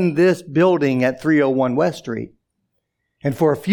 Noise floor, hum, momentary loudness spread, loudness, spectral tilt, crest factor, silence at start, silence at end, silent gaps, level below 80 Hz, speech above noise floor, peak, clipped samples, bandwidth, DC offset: -73 dBFS; none; 12 LU; -18 LUFS; -7.5 dB/octave; 14 dB; 0 s; 0 s; none; -60 dBFS; 56 dB; -4 dBFS; under 0.1%; 18.5 kHz; under 0.1%